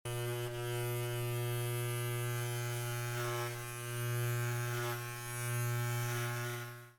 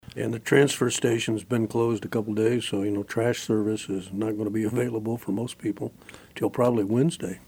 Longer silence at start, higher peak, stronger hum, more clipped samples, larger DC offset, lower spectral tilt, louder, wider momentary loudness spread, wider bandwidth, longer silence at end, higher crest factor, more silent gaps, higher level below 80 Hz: about the same, 0.05 s vs 0.15 s; second, -26 dBFS vs -6 dBFS; first, 60 Hz at -40 dBFS vs none; neither; neither; about the same, -4.5 dB/octave vs -5.5 dB/octave; second, -38 LUFS vs -26 LUFS; second, 4 LU vs 8 LU; first, over 20 kHz vs 17.5 kHz; about the same, 0.05 s vs 0.1 s; second, 10 dB vs 20 dB; neither; about the same, -62 dBFS vs -62 dBFS